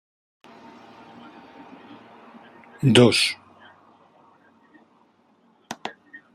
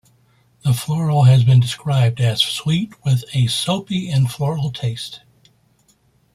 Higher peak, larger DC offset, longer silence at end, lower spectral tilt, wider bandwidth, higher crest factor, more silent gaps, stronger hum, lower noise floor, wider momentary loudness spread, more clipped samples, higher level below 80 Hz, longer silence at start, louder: about the same, -2 dBFS vs -2 dBFS; neither; second, 0.45 s vs 1.2 s; about the same, -5 dB/octave vs -6 dB/octave; about the same, 14.5 kHz vs 14.5 kHz; first, 26 dB vs 16 dB; neither; neither; about the same, -61 dBFS vs -59 dBFS; first, 30 LU vs 11 LU; neither; second, -66 dBFS vs -52 dBFS; first, 2.8 s vs 0.65 s; about the same, -19 LUFS vs -18 LUFS